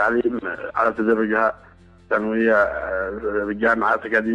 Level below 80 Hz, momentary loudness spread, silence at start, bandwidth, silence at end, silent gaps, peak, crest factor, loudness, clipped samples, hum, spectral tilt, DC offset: -48 dBFS; 7 LU; 0 s; 10 kHz; 0 s; none; -6 dBFS; 14 dB; -21 LUFS; under 0.1%; none; -7 dB/octave; under 0.1%